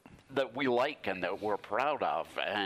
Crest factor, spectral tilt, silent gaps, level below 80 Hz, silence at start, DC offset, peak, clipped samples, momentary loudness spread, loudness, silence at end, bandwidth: 18 dB; -5 dB/octave; none; -72 dBFS; 0.1 s; under 0.1%; -14 dBFS; under 0.1%; 5 LU; -33 LUFS; 0 s; 15 kHz